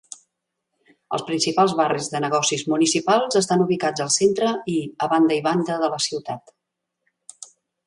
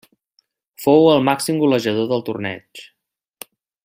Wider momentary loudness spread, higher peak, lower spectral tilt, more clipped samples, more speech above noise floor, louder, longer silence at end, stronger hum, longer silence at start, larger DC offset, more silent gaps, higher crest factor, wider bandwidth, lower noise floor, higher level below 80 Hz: second, 12 LU vs 26 LU; about the same, -4 dBFS vs -2 dBFS; second, -4 dB/octave vs -5.5 dB/octave; neither; first, 60 dB vs 48 dB; second, -21 LUFS vs -17 LUFS; second, 0.4 s vs 1.05 s; neither; first, 1.1 s vs 0.8 s; neither; neither; about the same, 18 dB vs 18 dB; second, 11.5 kHz vs 16 kHz; first, -80 dBFS vs -65 dBFS; second, -68 dBFS vs -62 dBFS